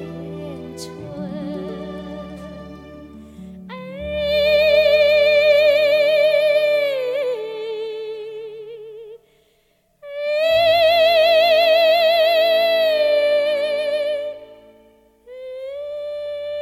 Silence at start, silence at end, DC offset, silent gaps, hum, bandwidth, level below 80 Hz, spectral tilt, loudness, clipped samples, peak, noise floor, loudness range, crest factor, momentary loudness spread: 0 s; 0 s; under 0.1%; none; none; 14.5 kHz; -50 dBFS; -4 dB/octave; -17 LUFS; under 0.1%; -6 dBFS; -62 dBFS; 15 LU; 14 dB; 21 LU